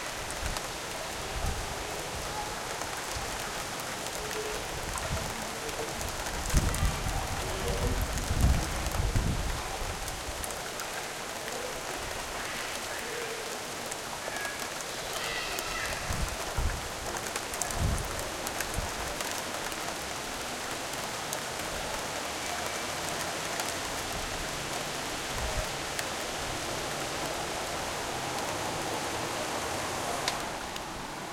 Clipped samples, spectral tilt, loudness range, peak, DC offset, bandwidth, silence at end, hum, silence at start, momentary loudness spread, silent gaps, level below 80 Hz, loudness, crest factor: under 0.1%; -3 dB/octave; 3 LU; -8 dBFS; under 0.1%; 17 kHz; 0 s; none; 0 s; 4 LU; none; -40 dBFS; -33 LUFS; 26 dB